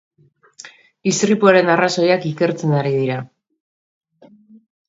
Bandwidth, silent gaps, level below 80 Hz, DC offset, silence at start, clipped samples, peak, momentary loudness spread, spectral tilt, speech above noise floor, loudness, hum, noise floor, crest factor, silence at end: 8 kHz; none; -64 dBFS; under 0.1%; 0.65 s; under 0.1%; 0 dBFS; 10 LU; -5 dB/octave; 34 dB; -17 LUFS; none; -49 dBFS; 18 dB; 1.6 s